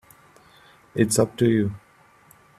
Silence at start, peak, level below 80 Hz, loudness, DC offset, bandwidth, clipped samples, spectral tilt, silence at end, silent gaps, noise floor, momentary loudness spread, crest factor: 0.95 s; -6 dBFS; -58 dBFS; -22 LUFS; under 0.1%; 15 kHz; under 0.1%; -5.5 dB/octave; 0.8 s; none; -55 dBFS; 13 LU; 20 dB